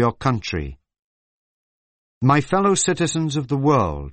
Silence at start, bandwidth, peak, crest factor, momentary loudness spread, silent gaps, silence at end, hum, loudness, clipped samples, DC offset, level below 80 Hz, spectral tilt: 0 s; 8.8 kHz; -4 dBFS; 18 dB; 9 LU; 0.99-2.21 s; 0 s; none; -20 LUFS; under 0.1%; under 0.1%; -42 dBFS; -5 dB/octave